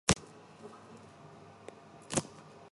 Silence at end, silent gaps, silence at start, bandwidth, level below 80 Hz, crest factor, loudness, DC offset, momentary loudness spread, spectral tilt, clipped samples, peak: 0.05 s; none; 0.05 s; 11.5 kHz; -54 dBFS; 32 dB; -35 LUFS; under 0.1%; 19 LU; -3.5 dB/octave; under 0.1%; -8 dBFS